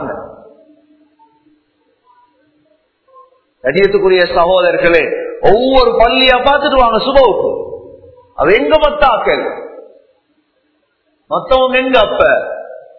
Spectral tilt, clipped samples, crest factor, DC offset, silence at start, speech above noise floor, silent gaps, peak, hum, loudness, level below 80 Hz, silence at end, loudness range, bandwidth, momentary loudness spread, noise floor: -6.5 dB/octave; 0.2%; 14 dB; under 0.1%; 0 s; 51 dB; none; 0 dBFS; none; -11 LUFS; -32 dBFS; 0.2 s; 6 LU; 6 kHz; 14 LU; -61 dBFS